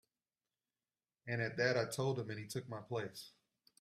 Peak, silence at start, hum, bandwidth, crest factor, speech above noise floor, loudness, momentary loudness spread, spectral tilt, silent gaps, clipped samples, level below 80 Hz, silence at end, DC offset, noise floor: -20 dBFS; 1.25 s; none; 15.5 kHz; 22 dB; over 51 dB; -40 LUFS; 17 LU; -5 dB/octave; none; under 0.1%; -78 dBFS; 0.5 s; under 0.1%; under -90 dBFS